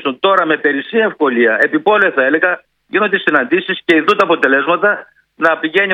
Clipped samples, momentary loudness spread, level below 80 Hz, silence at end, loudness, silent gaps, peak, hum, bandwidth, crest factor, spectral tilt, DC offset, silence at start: under 0.1%; 5 LU; -64 dBFS; 0 s; -13 LUFS; none; 0 dBFS; none; 9.6 kHz; 14 dB; -5.5 dB/octave; under 0.1%; 0 s